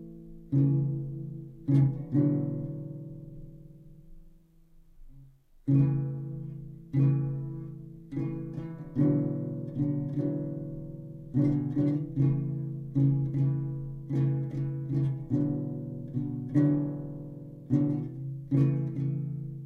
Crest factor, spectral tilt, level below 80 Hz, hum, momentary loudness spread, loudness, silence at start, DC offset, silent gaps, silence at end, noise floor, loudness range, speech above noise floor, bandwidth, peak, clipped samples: 16 dB; -12 dB/octave; -54 dBFS; none; 15 LU; -30 LUFS; 0 s; under 0.1%; none; 0 s; -57 dBFS; 4 LU; 32 dB; 2.6 kHz; -14 dBFS; under 0.1%